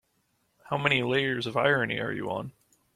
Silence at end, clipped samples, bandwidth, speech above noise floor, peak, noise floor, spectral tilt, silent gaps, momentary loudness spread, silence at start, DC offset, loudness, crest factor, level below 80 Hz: 0.45 s; under 0.1%; 14 kHz; 45 dB; -8 dBFS; -73 dBFS; -6 dB/octave; none; 10 LU; 0.65 s; under 0.1%; -27 LUFS; 22 dB; -64 dBFS